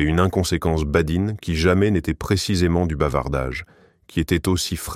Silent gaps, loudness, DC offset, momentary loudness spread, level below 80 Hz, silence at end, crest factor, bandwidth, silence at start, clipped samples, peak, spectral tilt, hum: none; -21 LUFS; under 0.1%; 6 LU; -32 dBFS; 0 s; 16 dB; 16 kHz; 0 s; under 0.1%; -4 dBFS; -5.5 dB/octave; none